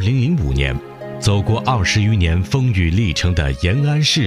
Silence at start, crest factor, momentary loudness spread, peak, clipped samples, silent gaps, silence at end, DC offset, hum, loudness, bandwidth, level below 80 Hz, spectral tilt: 0 s; 14 dB; 5 LU; -2 dBFS; under 0.1%; none; 0 s; under 0.1%; none; -17 LUFS; 12 kHz; -28 dBFS; -5.5 dB/octave